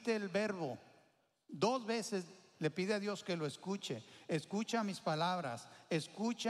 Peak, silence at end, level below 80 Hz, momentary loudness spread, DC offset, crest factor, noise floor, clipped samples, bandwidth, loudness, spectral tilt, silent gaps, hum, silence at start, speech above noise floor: -22 dBFS; 0 s; -86 dBFS; 9 LU; under 0.1%; 18 dB; -74 dBFS; under 0.1%; 13.5 kHz; -39 LUFS; -5 dB/octave; none; none; 0 s; 35 dB